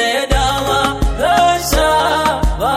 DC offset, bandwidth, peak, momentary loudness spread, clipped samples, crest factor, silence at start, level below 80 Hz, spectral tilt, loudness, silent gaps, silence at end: under 0.1%; 16 kHz; 0 dBFS; 4 LU; under 0.1%; 14 dB; 0 s; -22 dBFS; -4 dB/octave; -14 LUFS; none; 0 s